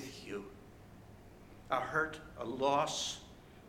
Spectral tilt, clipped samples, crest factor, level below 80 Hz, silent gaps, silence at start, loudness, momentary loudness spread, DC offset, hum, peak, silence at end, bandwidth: -3 dB/octave; under 0.1%; 22 dB; -62 dBFS; none; 0 s; -37 LUFS; 24 LU; under 0.1%; none; -18 dBFS; 0 s; 18.5 kHz